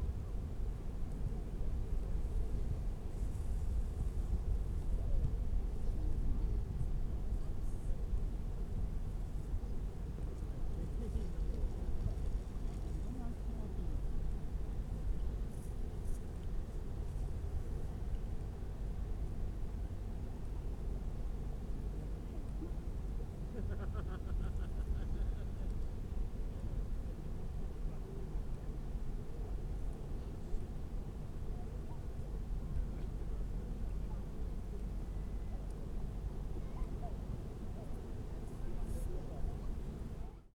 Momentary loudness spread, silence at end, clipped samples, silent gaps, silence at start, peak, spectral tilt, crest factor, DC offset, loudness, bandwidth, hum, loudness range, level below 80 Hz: 5 LU; 0.1 s; under 0.1%; none; 0 s; -24 dBFS; -8 dB/octave; 16 dB; under 0.1%; -44 LUFS; 11.5 kHz; none; 5 LU; -40 dBFS